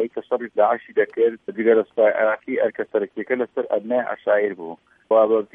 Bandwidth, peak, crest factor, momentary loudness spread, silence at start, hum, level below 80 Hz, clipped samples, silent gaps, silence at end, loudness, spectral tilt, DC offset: 3.7 kHz; -4 dBFS; 16 dB; 8 LU; 0 s; none; -76 dBFS; under 0.1%; none; 0.1 s; -21 LUFS; -8.5 dB/octave; under 0.1%